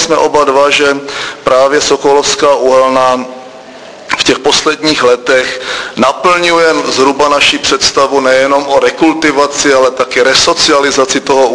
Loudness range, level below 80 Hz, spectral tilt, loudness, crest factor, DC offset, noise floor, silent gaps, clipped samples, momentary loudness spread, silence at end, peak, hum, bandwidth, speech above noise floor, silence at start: 2 LU; -42 dBFS; -2 dB/octave; -8 LUFS; 8 dB; under 0.1%; -30 dBFS; none; 0.8%; 5 LU; 0 s; 0 dBFS; none; 11 kHz; 21 dB; 0 s